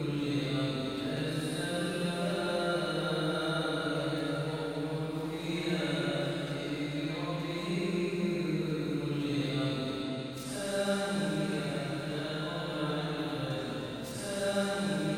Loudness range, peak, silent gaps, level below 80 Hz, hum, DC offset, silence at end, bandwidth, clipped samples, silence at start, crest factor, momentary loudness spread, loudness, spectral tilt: 2 LU; -20 dBFS; none; -60 dBFS; none; under 0.1%; 0 s; 16 kHz; under 0.1%; 0 s; 14 dB; 4 LU; -33 LUFS; -5.5 dB/octave